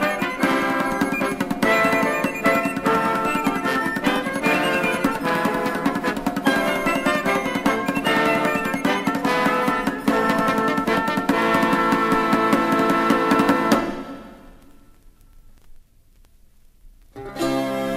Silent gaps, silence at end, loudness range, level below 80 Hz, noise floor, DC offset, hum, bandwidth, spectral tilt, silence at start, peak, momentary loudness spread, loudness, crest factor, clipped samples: none; 0 s; 4 LU; -48 dBFS; -52 dBFS; under 0.1%; none; 16 kHz; -5 dB/octave; 0 s; -2 dBFS; 5 LU; -20 LUFS; 18 dB; under 0.1%